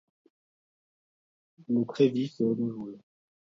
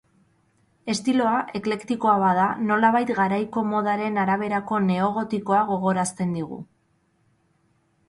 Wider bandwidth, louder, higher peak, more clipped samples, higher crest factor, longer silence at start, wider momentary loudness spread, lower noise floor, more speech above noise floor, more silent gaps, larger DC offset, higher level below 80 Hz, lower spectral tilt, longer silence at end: second, 7.4 kHz vs 11.5 kHz; second, -28 LUFS vs -23 LUFS; second, -12 dBFS vs -8 dBFS; neither; about the same, 20 dB vs 16 dB; first, 1.7 s vs 0.85 s; first, 13 LU vs 8 LU; first, under -90 dBFS vs -66 dBFS; first, over 62 dB vs 44 dB; neither; neither; second, -78 dBFS vs -64 dBFS; first, -8 dB/octave vs -6 dB/octave; second, 0.45 s vs 1.45 s